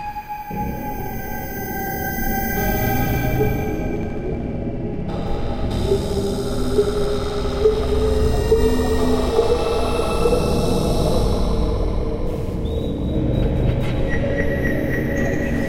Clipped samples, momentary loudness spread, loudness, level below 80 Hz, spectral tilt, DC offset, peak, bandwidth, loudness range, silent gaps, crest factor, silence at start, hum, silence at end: under 0.1%; 8 LU; -21 LUFS; -26 dBFS; -6.5 dB/octave; under 0.1%; -4 dBFS; 16 kHz; 4 LU; none; 16 dB; 0 s; none; 0 s